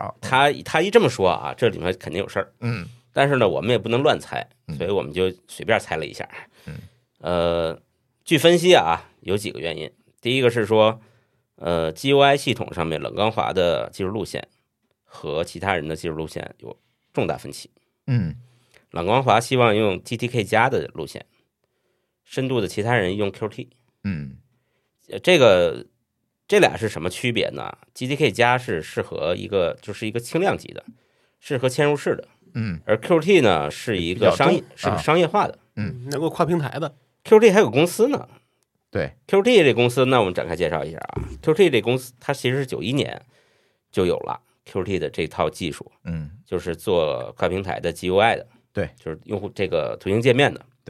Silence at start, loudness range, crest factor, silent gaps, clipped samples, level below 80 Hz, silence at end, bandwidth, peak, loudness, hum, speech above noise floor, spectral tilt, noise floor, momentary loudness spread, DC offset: 0 s; 7 LU; 20 dB; none; under 0.1%; -52 dBFS; 0.3 s; 14.5 kHz; -2 dBFS; -21 LUFS; none; 54 dB; -5.5 dB/octave; -75 dBFS; 16 LU; under 0.1%